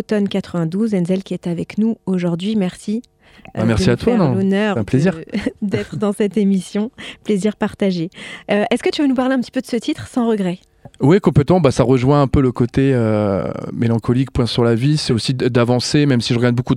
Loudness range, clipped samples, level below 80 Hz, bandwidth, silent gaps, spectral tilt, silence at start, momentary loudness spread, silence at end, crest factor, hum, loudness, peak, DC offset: 4 LU; under 0.1%; -40 dBFS; 12.5 kHz; none; -7 dB/octave; 0 s; 9 LU; 0 s; 16 dB; none; -17 LUFS; 0 dBFS; under 0.1%